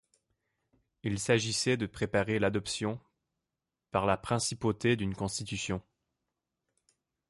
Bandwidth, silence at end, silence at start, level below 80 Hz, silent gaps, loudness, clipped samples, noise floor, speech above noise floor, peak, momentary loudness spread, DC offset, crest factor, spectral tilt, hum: 11.5 kHz; 1.5 s; 1.05 s; -56 dBFS; none; -32 LUFS; under 0.1%; -89 dBFS; 58 dB; -12 dBFS; 8 LU; under 0.1%; 22 dB; -4.5 dB/octave; none